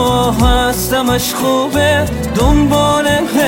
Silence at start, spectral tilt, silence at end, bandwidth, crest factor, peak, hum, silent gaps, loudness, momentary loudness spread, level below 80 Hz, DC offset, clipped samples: 0 s; -4.5 dB/octave; 0 s; 17.5 kHz; 12 dB; 0 dBFS; none; none; -13 LUFS; 3 LU; -22 dBFS; under 0.1%; under 0.1%